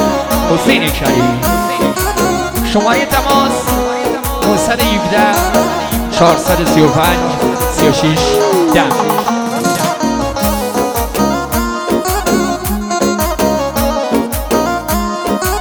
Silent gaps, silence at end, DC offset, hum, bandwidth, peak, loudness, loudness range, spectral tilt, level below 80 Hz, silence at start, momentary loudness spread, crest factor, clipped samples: none; 0 s; under 0.1%; none; over 20 kHz; 0 dBFS; -13 LUFS; 3 LU; -4.5 dB/octave; -26 dBFS; 0 s; 5 LU; 12 dB; under 0.1%